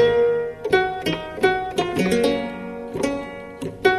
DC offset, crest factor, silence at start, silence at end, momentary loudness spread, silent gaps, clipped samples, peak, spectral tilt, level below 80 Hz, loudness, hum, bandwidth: under 0.1%; 18 dB; 0 s; 0 s; 12 LU; none; under 0.1%; -4 dBFS; -5 dB/octave; -48 dBFS; -22 LUFS; none; 13.5 kHz